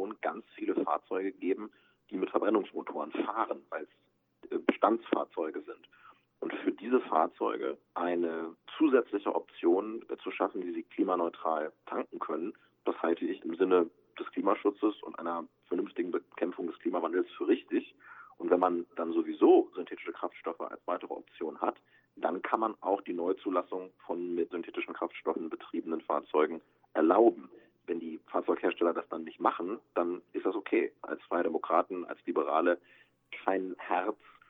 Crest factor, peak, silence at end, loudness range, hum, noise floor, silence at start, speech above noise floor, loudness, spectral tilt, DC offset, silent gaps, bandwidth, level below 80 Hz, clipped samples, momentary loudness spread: 22 dB; -10 dBFS; 0.35 s; 4 LU; none; -60 dBFS; 0 s; 29 dB; -32 LUFS; -8 dB/octave; under 0.1%; none; 3.9 kHz; -84 dBFS; under 0.1%; 12 LU